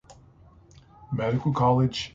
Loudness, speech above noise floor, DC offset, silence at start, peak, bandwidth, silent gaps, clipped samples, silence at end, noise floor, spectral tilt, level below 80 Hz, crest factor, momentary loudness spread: -25 LUFS; 30 dB; under 0.1%; 0.1 s; -8 dBFS; 7.8 kHz; none; under 0.1%; 0.05 s; -54 dBFS; -7 dB/octave; -52 dBFS; 18 dB; 8 LU